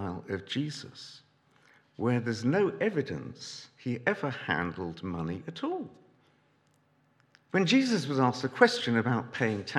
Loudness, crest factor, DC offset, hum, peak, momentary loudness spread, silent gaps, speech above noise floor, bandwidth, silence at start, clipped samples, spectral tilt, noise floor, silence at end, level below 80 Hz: -30 LUFS; 24 dB; under 0.1%; none; -6 dBFS; 16 LU; none; 38 dB; 11.5 kHz; 0 s; under 0.1%; -5.5 dB/octave; -68 dBFS; 0 s; -72 dBFS